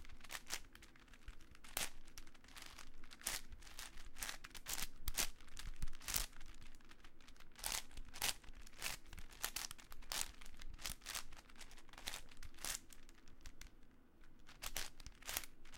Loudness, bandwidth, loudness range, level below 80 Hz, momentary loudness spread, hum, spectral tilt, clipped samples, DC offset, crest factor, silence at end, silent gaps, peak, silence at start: -47 LUFS; 17 kHz; 5 LU; -54 dBFS; 20 LU; none; -0.5 dB/octave; under 0.1%; under 0.1%; 30 dB; 0 s; none; -16 dBFS; 0 s